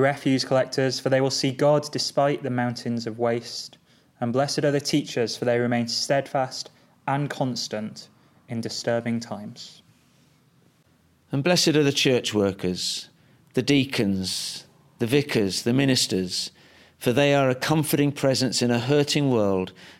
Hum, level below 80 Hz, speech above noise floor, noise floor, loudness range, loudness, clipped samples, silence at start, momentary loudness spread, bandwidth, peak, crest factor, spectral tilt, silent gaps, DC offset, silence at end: none; -64 dBFS; 38 dB; -61 dBFS; 7 LU; -24 LUFS; under 0.1%; 0 s; 13 LU; 16.5 kHz; -6 dBFS; 18 dB; -4.5 dB/octave; none; under 0.1%; 0.05 s